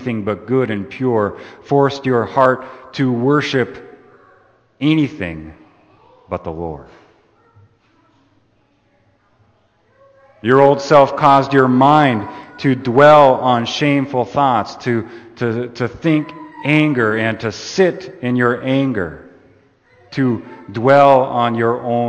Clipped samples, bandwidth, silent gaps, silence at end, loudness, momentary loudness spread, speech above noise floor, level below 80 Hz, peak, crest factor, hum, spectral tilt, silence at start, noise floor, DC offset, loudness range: under 0.1%; 8.6 kHz; none; 0 s; -15 LUFS; 16 LU; 44 dB; -52 dBFS; 0 dBFS; 16 dB; none; -6.5 dB/octave; 0 s; -58 dBFS; under 0.1%; 11 LU